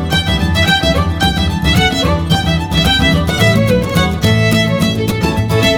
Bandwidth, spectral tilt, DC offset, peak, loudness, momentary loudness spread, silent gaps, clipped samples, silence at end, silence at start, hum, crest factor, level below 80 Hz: 20 kHz; -5 dB/octave; under 0.1%; 0 dBFS; -12 LUFS; 4 LU; none; under 0.1%; 0 s; 0 s; none; 12 dB; -24 dBFS